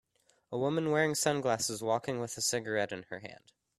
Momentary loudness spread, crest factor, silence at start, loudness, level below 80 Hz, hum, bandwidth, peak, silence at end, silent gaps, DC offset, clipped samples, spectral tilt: 13 LU; 20 dB; 0.5 s; -32 LUFS; -72 dBFS; none; 15.5 kHz; -14 dBFS; 0.45 s; none; under 0.1%; under 0.1%; -3.5 dB/octave